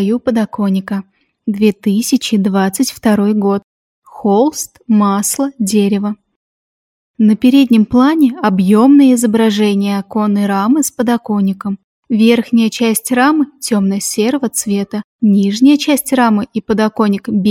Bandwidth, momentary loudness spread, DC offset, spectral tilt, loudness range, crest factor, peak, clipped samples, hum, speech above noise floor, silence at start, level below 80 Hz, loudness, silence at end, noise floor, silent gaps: 16.5 kHz; 8 LU; under 0.1%; -5 dB/octave; 4 LU; 12 dB; 0 dBFS; under 0.1%; none; over 78 dB; 0 s; -54 dBFS; -13 LUFS; 0 s; under -90 dBFS; 3.64-4.02 s, 6.36-7.14 s, 11.84-12.03 s, 15.04-15.19 s